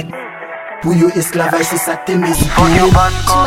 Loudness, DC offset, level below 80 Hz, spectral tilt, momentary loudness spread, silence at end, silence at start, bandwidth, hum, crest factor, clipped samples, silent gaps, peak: -12 LUFS; under 0.1%; -24 dBFS; -5 dB/octave; 17 LU; 0 s; 0 s; 16.5 kHz; none; 12 dB; under 0.1%; none; 0 dBFS